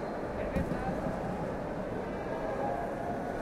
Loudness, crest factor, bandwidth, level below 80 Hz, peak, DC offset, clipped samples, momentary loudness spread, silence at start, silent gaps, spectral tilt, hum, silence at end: -35 LUFS; 16 dB; 15.5 kHz; -48 dBFS; -20 dBFS; under 0.1%; under 0.1%; 3 LU; 0 s; none; -7.5 dB/octave; none; 0 s